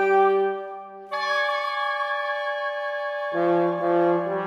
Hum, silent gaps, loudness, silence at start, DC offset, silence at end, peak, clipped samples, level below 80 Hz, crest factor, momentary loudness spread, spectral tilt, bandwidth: none; none; -24 LUFS; 0 s; under 0.1%; 0 s; -10 dBFS; under 0.1%; -82 dBFS; 14 dB; 8 LU; -6 dB/octave; 8.8 kHz